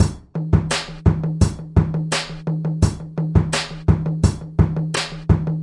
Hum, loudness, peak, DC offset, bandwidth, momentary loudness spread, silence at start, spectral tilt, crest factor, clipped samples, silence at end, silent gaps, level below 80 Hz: none; -21 LUFS; -2 dBFS; under 0.1%; 11.5 kHz; 5 LU; 0 s; -6 dB/octave; 18 dB; under 0.1%; 0 s; none; -30 dBFS